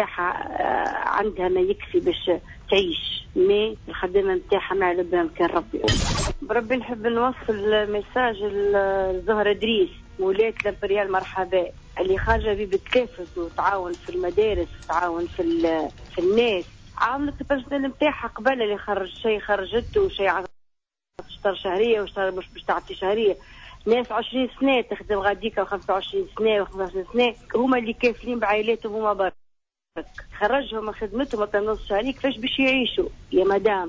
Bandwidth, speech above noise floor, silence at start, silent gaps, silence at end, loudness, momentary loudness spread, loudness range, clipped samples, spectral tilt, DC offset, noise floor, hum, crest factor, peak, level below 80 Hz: 8 kHz; 49 dB; 0 s; none; 0 s; -24 LUFS; 7 LU; 3 LU; under 0.1%; -5 dB/octave; under 0.1%; -72 dBFS; none; 14 dB; -8 dBFS; -42 dBFS